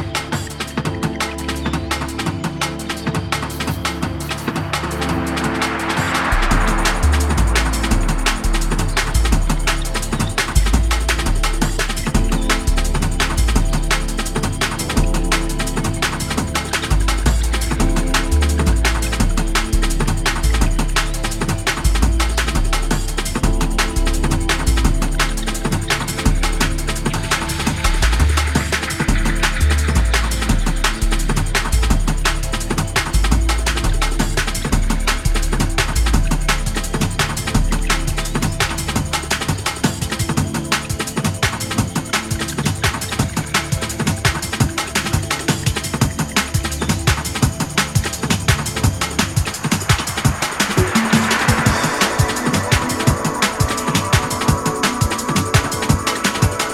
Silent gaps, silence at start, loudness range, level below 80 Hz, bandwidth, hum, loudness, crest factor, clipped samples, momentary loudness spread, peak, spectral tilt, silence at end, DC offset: none; 0 s; 3 LU; -20 dBFS; 16.5 kHz; none; -19 LUFS; 18 dB; under 0.1%; 5 LU; 0 dBFS; -4 dB/octave; 0 s; under 0.1%